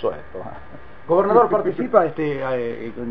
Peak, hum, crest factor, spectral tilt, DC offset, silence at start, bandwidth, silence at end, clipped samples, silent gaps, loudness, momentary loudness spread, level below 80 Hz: -2 dBFS; none; 20 dB; -9.5 dB/octave; 2%; 0 s; 5 kHz; 0 s; under 0.1%; none; -20 LUFS; 20 LU; -50 dBFS